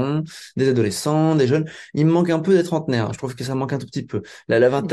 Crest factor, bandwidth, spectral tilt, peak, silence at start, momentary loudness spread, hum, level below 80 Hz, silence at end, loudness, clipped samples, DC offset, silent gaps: 14 dB; 12.5 kHz; -6.5 dB/octave; -6 dBFS; 0 s; 11 LU; none; -58 dBFS; 0 s; -20 LUFS; under 0.1%; under 0.1%; none